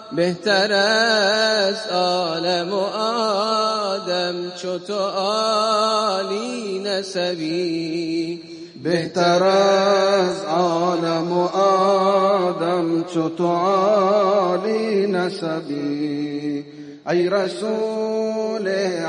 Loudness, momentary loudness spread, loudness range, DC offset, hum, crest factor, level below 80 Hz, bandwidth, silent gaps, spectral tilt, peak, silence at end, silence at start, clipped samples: -20 LUFS; 9 LU; 5 LU; under 0.1%; none; 16 dB; -72 dBFS; 10.5 kHz; none; -4.5 dB/octave; -4 dBFS; 0 s; 0 s; under 0.1%